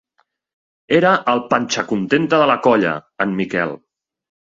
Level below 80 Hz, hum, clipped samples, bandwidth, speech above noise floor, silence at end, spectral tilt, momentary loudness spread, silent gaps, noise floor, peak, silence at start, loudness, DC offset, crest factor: -58 dBFS; none; under 0.1%; 7.8 kHz; 49 dB; 0.7 s; -5 dB/octave; 8 LU; none; -65 dBFS; 0 dBFS; 0.9 s; -17 LUFS; under 0.1%; 18 dB